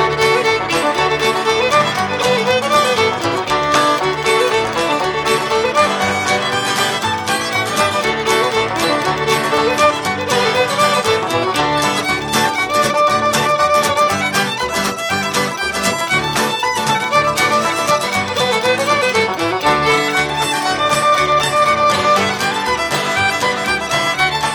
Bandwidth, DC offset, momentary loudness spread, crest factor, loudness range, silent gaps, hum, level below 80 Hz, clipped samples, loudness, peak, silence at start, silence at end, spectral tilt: 17 kHz; under 0.1%; 4 LU; 14 dB; 2 LU; none; none; -46 dBFS; under 0.1%; -15 LUFS; 0 dBFS; 0 s; 0 s; -3 dB/octave